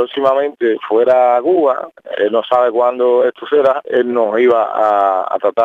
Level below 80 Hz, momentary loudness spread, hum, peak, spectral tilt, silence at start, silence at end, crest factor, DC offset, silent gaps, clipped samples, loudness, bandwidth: -70 dBFS; 5 LU; none; 0 dBFS; -6 dB/octave; 0 s; 0 s; 14 dB; under 0.1%; none; under 0.1%; -14 LUFS; 7.2 kHz